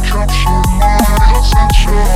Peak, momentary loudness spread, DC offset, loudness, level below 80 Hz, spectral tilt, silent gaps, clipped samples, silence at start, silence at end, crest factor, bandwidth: 0 dBFS; 2 LU; under 0.1%; -12 LUFS; -10 dBFS; -5 dB/octave; none; 0.2%; 0 s; 0 s; 8 dB; 15.5 kHz